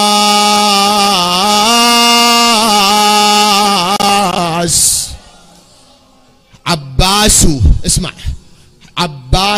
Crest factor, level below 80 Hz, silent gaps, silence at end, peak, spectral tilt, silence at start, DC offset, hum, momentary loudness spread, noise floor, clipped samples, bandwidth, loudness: 10 dB; -22 dBFS; none; 0 s; 0 dBFS; -2.5 dB/octave; 0 s; under 0.1%; none; 11 LU; -46 dBFS; under 0.1%; 16.5 kHz; -9 LUFS